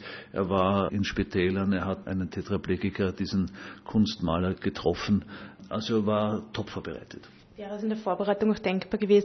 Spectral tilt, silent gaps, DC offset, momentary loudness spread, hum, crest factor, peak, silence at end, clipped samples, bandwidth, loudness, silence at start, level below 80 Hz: -7 dB/octave; none; under 0.1%; 12 LU; none; 18 dB; -10 dBFS; 0 s; under 0.1%; 6.4 kHz; -29 LUFS; 0 s; -54 dBFS